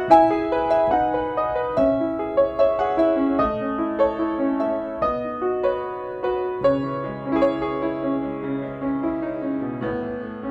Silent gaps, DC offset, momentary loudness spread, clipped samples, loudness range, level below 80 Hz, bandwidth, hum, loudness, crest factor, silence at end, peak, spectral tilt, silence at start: none; under 0.1%; 8 LU; under 0.1%; 4 LU; -48 dBFS; 7.8 kHz; none; -23 LUFS; 20 dB; 0 s; -2 dBFS; -8 dB/octave; 0 s